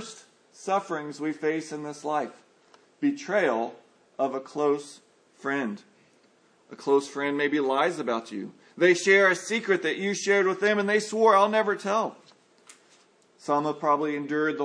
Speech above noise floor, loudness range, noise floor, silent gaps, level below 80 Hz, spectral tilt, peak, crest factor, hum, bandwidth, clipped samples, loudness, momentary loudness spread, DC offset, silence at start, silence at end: 37 dB; 8 LU; -62 dBFS; none; -86 dBFS; -4 dB/octave; -8 dBFS; 20 dB; none; 10.5 kHz; under 0.1%; -26 LUFS; 15 LU; under 0.1%; 0 s; 0 s